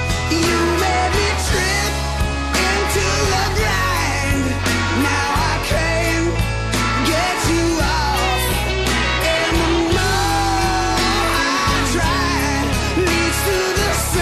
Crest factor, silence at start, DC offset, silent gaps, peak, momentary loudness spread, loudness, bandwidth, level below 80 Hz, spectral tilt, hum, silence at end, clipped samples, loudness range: 10 dB; 0 s; under 0.1%; none; -8 dBFS; 2 LU; -17 LUFS; 14 kHz; -26 dBFS; -4 dB/octave; none; 0 s; under 0.1%; 1 LU